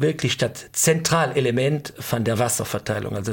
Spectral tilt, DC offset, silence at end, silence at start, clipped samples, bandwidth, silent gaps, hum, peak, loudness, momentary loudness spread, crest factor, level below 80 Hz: -4 dB/octave; under 0.1%; 0 s; 0 s; under 0.1%; 17 kHz; none; none; -6 dBFS; -22 LUFS; 7 LU; 16 dB; -54 dBFS